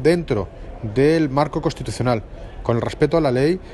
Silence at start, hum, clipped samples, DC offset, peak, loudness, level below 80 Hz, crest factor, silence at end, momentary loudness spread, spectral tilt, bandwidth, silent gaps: 0 s; none; under 0.1%; under 0.1%; -4 dBFS; -20 LUFS; -38 dBFS; 16 dB; 0 s; 10 LU; -7 dB/octave; 12 kHz; none